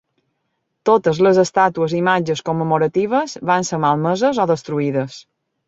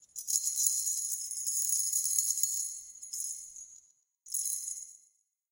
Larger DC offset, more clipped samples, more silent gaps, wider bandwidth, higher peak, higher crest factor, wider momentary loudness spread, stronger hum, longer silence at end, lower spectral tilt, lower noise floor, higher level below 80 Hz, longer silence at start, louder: neither; neither; neither; second, 8 kHz vs 17 kHz; first, -2 dBFS vs -8 dBFS; second, 16 dB vs 28 dB; second, 7 LU vs 15 LU; neither; about the same, 0.45 s vs 0.55 s; first, -5.5 dB/octave vs 5.5 dB/octave; about the same, -72 dBFS vs -70 dBFS; first, -60 dBFS vs -82 dBFS; first, 0.85 s vs 0 s; first, -17 LUFS vs -30 LUFS